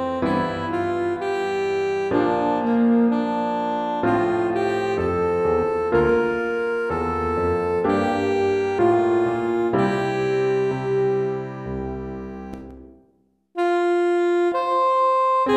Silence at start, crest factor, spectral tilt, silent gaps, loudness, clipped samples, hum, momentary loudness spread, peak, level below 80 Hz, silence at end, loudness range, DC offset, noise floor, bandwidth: 0 s; 14 dB; -7 dB/octave; none; -21 LUFS; under 0.1%; none; 9 LU; -8 dBFS; -46 dBFS; 0 s; 4 LU; under 0.1%; -63 dBFS; 9.4 kHz